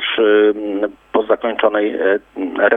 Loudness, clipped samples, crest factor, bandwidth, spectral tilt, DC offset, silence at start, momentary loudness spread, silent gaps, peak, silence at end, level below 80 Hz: -17 LUFS; under 0.1%; 16 dB; 3.8 kHz; -6.5 dB/octave; under 0.1%; 0 s; 9 LU; none; 0 dBFS; 0 s; -58 dBFS